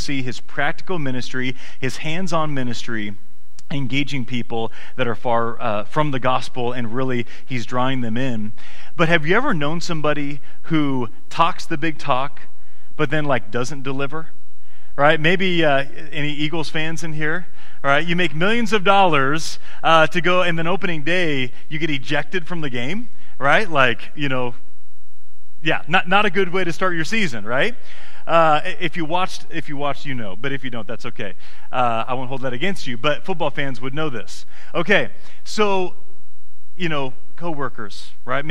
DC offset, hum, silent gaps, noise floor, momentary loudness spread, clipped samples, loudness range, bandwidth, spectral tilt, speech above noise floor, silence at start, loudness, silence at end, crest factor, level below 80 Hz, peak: 20%; none; none; -59 dBFS; 13 LU; under 0.1%; 7 LU; 14 kHz; -5 dB/octave; 37 dB; 0 s; -21 LUFS; 0 s; 22 dB; -50 dBFS; 0 dBFS